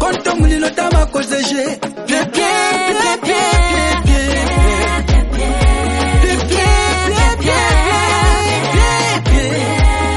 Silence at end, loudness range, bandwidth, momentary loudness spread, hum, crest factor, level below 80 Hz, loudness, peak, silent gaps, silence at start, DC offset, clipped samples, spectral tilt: 0 s; 2 LU; 11.5 kHz; 4 LU; none; 12 dB; -16 dBFS; -14 LUFS; 0 dBFS; none; 0 s; under 0.1%; under 0.1%; -4.5 dB/octave